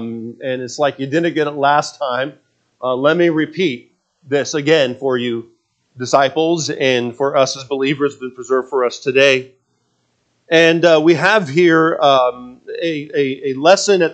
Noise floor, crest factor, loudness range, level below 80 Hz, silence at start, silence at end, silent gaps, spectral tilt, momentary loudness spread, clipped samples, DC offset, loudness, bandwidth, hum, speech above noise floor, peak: -65 dBFS; 16 dB; 4 LU; -68 dBFS; 0 s; 0 s; none; -4.5 dB/octave; 11 LU; under 0.1%; under 0.1%; -15 LUFS; 8.8 kHz; none; 49 dB; 0 dBFS